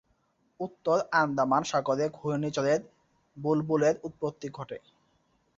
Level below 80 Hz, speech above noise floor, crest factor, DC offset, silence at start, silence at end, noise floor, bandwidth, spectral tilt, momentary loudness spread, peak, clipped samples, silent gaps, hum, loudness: -68 dBFS; 43 dB; 20 dB; under 0.1%; 0.6 s; 0.8 s; -71 dBFS; 7.8 kHz; -5.5 dB/octave; 14 LU; -10 dBFS; under 0.1%; none; none; -29 LUFS